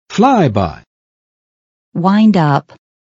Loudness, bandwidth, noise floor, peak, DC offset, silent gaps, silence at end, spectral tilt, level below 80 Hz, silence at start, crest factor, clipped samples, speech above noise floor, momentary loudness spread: -13 LUFS; 7.6 kHz; under -90 dBFS; 0 dBFS; under 0.1%; 0.87-1.92 s; 0.55 s; -7.5 dB/octave; -48 dBFS; 0.1 s; 14 dB; under 0.1%; over 79 dB; 10 LU